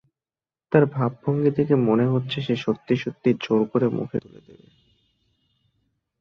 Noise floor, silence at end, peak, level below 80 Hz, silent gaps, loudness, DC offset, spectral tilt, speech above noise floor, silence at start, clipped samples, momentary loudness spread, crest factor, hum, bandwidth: under -90 dBFS; 2 s; -2 dBFS; -62 dBFS; none; -23 LUFS; under 0.1%; -8.5 dB/octave; over 68 dB; 0.7 s; under 0.1%; 6 LU; 22 dB; none; 6.6 kHz